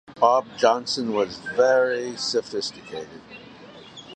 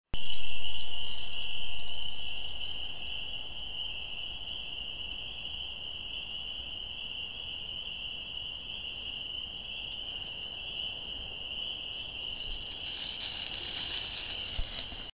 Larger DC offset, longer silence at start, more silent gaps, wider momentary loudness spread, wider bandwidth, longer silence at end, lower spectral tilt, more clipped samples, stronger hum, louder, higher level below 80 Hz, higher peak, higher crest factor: neither; about the same, 0.1 s vs 0.05 s; neither; first, 23 LU vs 2 LU; first, 9.4 kHz vs 4 kHz; about the same, 0 s vs 0.05 s; second, -3 dB/octave vs -5.5 dB/octave; neither; neither; first, -22 LUFS vs -36 LUFS; second, -66 dBFS vs -52 dBFS; first, -4 dBFS vs -14 dBFS; first, 20 dB vs 14 dB